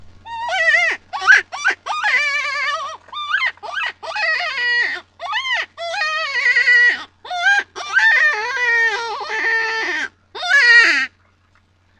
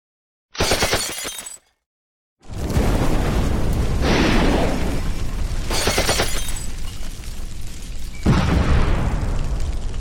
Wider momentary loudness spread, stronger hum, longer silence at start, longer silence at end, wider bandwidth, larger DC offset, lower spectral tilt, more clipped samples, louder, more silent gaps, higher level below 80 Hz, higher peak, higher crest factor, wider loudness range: second, 13 LU vs 16 LU; neither; second, 0 s vs 0.55 s; first, 0.9 s vs 0 s; second, 10.5 kHz vs 18 kHz; neither; second, 0.5 dB/octave vs -4.5 dB/octave; neither; first, -15 LUFS vs -21 LUFS; second, none vs 1.86-2.37 s; second, -62 dBFS vs -24 dBFS; first, 0 dBFS vs -4 dBFS; about the same, 18 dB vs 16 dB; about the same, 5 LU vs 3 LU